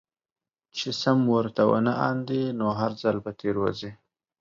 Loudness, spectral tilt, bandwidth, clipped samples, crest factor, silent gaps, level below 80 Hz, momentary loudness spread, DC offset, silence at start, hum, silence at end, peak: -25 LUFS; -6.5 dB/octave; 7.6 kHz; under 0.1%; 18 dB; none; -62 dBFS; 10 LU; under 0.1%; 0.75 s; none; 0.45 s; -8 dBFS